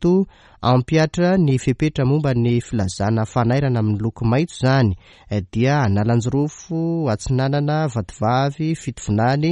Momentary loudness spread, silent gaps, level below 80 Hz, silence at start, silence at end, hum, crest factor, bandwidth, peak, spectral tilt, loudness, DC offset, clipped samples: 7 LU; none; -42 dBFS; 0 s; 0 s; none; 16 dB; 10.5 kHz; -4 dBFS; -7 dB/octave; -20 LUFS; under 0.1%; under 0.1%